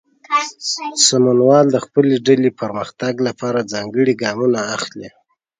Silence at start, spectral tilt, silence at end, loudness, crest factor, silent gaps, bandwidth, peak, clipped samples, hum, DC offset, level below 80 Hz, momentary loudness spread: 0.3 s; -4 dB/octave; 0.5 s; -16 LUFS; 16 dB; none; 9.6 kHz; 0 dBFS; under 0.1%; none; under 0.1%; -62 dBFS; 11 LU